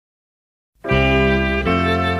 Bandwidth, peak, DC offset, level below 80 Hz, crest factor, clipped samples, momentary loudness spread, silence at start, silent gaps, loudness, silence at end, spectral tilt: 12 kHz; -4 dBFS; under 0.1%; -28 dBFS; 14 dB; under 0.1%; 5 LU; 0.85 s; none; -17 LUFS; 0 s; -7 dB/octave